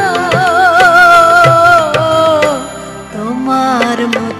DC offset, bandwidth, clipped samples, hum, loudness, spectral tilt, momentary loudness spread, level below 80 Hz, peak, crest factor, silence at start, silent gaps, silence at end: under 0.1%; 14.5 kHz; 0.8%; none; -8 LUFS; -4.5 dB/octave; 15 LU; -42 dBFS; 0 dBFS; 10 dB; 0 s; none; 0 s